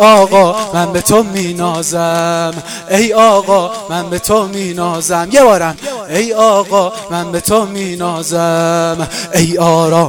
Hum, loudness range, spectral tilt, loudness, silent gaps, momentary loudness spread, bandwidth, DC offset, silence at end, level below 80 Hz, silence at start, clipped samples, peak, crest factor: none; 2 LU; -4.5 dB/octave; -12 LUFS; none; 10 LU; 20 kHz; under 0.1%; 0 s; -42 dBFS; 0 s; 0.3%; 0 dBFS; 12 dB